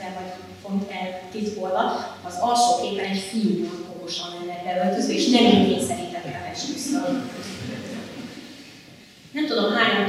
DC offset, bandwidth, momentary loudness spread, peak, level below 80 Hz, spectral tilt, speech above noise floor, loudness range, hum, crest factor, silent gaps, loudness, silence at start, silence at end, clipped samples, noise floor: under 0.1%; 15 kHz; 16 LU; -2 dBFS; -68 dBFS; -4 dB/octave; 25 dB; 8 LU; none; 22 dB; none; -24 LUFS; 0 s; 0 s; under 0.1%; -47 dBFS